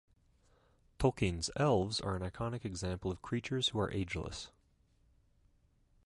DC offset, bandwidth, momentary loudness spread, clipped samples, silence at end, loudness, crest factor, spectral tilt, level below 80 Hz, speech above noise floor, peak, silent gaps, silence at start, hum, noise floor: under 0.1%; 11.5 kHz; 9 LU; under 0.1%; 1.6 s; -36 LUFS; 22 dB; -5 dB/octave; -52 dBFS; 36 dB; -16 dBFS; none; 1 s; none; -71 dBFS